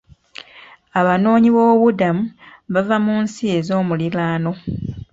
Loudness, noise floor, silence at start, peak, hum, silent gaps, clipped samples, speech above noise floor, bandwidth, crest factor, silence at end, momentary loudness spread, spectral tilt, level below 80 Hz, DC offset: -17 LUFS; -45 dBFS; 0.55 s; -2 dBFS; none; none; under 0.1%; 28 dB; 7.8 kHz; 16 dB; 0.15 s; 15 LU; -7.5 dB/octave; -48 dBFS; under 0.1%